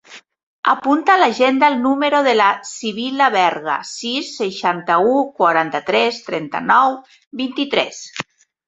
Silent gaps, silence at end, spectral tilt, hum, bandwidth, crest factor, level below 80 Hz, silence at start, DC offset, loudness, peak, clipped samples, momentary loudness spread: 0.43-0.63 s, 7.27-7.31 s; 0.45 s; -3.5 dB/octave; none; 8.2 kHz; 16 dB; -66 dBFS; 0.1 s; under 0.1%; -17 LUFS; -2 dBFS; under 0.1%; 11 LU